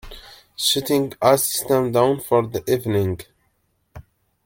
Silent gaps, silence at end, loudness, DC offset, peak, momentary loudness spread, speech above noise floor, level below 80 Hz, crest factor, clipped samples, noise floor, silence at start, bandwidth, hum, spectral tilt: none; 0.45 s; -20 LUFS; under 0.1%; -2 dBFS; 15 LU; 48 dB; -50 dBFS; 20 dB; under 0.1%; -67 dBFS; 0.05 s; 17 kHz; none; -4.5 dB/octave